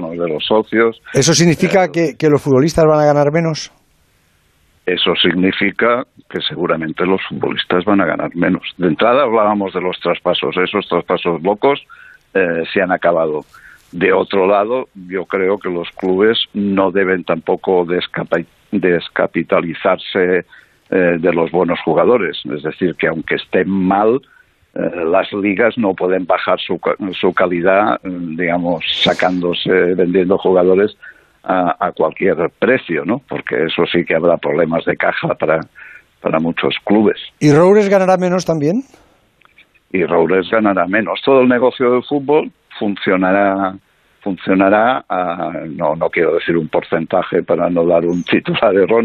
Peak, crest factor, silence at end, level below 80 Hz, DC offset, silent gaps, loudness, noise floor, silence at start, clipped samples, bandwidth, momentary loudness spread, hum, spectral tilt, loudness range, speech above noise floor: -2 dBFS; 14 dB; 0 s; -52 dBFS; under 0.1%; none; -15 LUFS; -56 dBFS; 0 s; under 0.1%; 13 kHz; 8 LU; none; -5.5 dB/octave; 3 LU; 42 dB